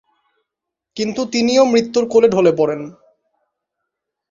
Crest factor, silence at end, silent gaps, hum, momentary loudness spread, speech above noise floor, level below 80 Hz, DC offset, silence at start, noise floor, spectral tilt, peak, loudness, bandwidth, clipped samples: 16 dB; 1.4 s; none; none; 14 LU; 67 dB; -60 dBFS; under 0.1%; 0.95 s; -82 dBFS; -5 dB/octave; -2 dBFS; -15 LUFS; 7.6 kHz; under 0.1%